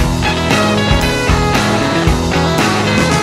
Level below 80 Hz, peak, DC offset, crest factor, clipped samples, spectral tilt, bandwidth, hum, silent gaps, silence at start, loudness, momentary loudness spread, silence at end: -22 dBFS; 0 dBFS; under 0.1%; 12 dB; under 0.1%; -5 dB/octave; 16.5 kHz; none; none; 0 s; -13 LUFS; 1 LU; 0 s